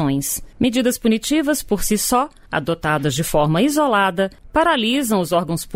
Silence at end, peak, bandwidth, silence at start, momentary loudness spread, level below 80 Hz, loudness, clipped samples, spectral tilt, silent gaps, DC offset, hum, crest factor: 0 s; -6 dBFS; 16.5 kHz; 0 s; 5 LU; -38 dBFS; -19 LUFS; under 0.1%; -4.5 dB/octave; none; under 0.1%; none; 14 dB